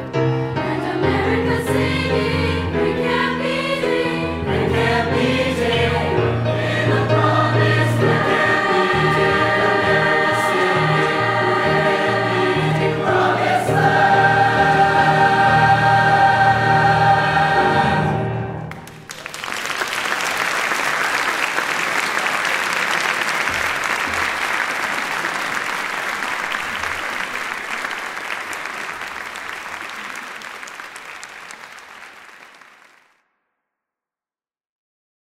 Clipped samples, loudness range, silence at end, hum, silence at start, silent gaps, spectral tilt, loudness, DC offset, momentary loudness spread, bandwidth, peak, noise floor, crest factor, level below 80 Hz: under 0.1%; 13 LU; 2.85 s; none; 0 s; none; -5 dB/octave; -17 LUFS; under 0.1%; 14 LU; 16 kHz; -2 dBFS; under -90 dBFS; 16 dB; -44 dBFS